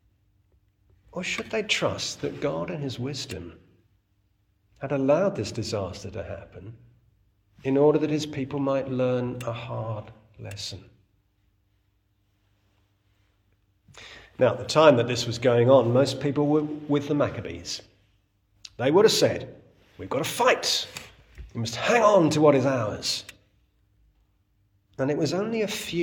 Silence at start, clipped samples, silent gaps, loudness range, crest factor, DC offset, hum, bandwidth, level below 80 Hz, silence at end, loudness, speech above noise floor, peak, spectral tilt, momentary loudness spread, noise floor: 1.15 s; under 0.1%; none; 11 LU; 22 dB; under 0.1%; none; 18 kHz; -60 dBFS; 0 s; -24 LUFS; 45 dB; -4 dBFS; -5 dB/octave; 20 LU; -69 dBFS